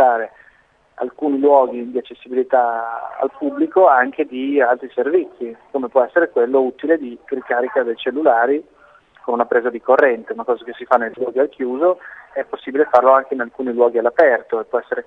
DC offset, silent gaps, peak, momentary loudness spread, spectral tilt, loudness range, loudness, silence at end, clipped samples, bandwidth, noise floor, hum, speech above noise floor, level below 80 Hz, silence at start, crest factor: under 0.1%; none; 0 dBFS; 13 LU; -6.5 dB/octave; 2 LU; -18 LUFS; 0.05 s; under 0.1%; 5 kHz; -55 dBFS; none; 37 dB; -66 dBFS; 0 s; 18 dB